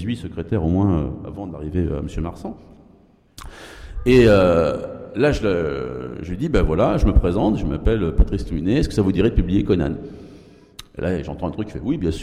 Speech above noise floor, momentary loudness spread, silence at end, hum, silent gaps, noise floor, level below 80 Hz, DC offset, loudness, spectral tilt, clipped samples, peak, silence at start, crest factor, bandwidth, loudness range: 33 dB; 16 LU; 0 s; none; none; -52 dBFS; -28 dBFS; under 0.1%; -20 LUFS; -7.5 dB/octave; under 0.1%; -4 dBFS; 0 s; 16 dB; 13.5 kHz; 6 LU